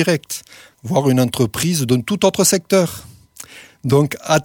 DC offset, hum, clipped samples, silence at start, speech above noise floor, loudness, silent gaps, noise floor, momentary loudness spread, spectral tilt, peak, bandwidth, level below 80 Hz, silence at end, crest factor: under 0.1%; none; under 0.1%; 0 s; 23 dB; -17 LUFS; none; -40 dBFS; 21 LU; -4.5 dB/octave; -2 dBFS; 18.5 kHz; -52 dBFS; 0 s; 16 dB